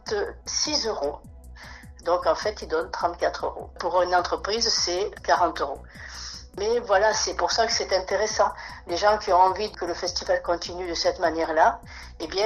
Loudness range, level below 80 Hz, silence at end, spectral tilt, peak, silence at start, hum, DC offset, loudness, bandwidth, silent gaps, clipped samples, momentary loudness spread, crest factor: 4 LU; -46 dBFS; 0 s; -2 dB/octave; -6 dBFS; 0.05 s; none; under 0.1%; -24 LUFS; 13 kHz; none; under 0.1%; 15 LU; 18 dB